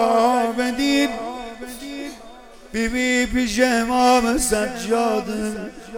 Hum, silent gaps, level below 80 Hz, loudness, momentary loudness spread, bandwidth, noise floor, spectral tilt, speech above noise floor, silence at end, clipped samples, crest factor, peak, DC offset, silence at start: none; none; -40 dBFS; -20 LUFS; 16 LU; 17.5 kHz; -42 dBFS; -3 dB/octave; 22 dB; 0 s; under 0.1%; 18 dB; -2 dBFS; under 0.1%; 0 s